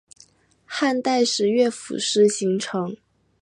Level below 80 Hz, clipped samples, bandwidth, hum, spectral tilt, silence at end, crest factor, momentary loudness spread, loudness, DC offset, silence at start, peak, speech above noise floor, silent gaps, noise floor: -72 dBFS; under 0.1%; 11.5 kHz; none; -3.5 dB/octave; 0.45 s; 16 dB; 12 LU; -22 LUFS; under 0.1%; 0.7 s; -6 dBFS; 34 dB; none; -55 dBFS